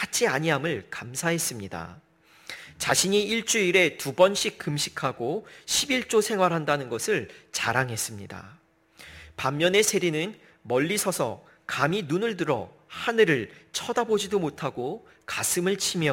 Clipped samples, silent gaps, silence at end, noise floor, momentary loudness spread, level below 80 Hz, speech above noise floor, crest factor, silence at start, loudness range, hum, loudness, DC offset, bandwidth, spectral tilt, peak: under 0.1%; none; 0 s; -52 dBFS; 15 LU; -62 dBFS; 27 dB; 20 dB; 0 s; 3 LU; none; -25 LUFS; under 0.1%; 16.5 kHz; -3 dB/octave; -6 dBFS